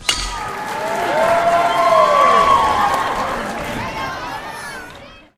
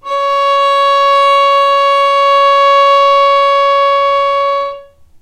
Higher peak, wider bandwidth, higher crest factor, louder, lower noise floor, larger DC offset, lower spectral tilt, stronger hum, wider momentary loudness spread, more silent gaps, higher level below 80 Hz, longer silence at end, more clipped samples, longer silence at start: about the same, 0 dBFS vs 0 dBFS; first, 16 kHz vs 11 kHz; first, 16 dB vs 8 dB; second, -16 LUFS vs -9 LUFS; first, -39 dBFS vs -32 dBFS; neither; first, -3 dB/octave vs 0 dB/octave; neither; first, 16 LU vs 5 LU; neither; first, -40 dBFS vs -50 dBFS; second, 0.2 s vs 0.4 s; neither; about the same, 0 s vs 0.05 s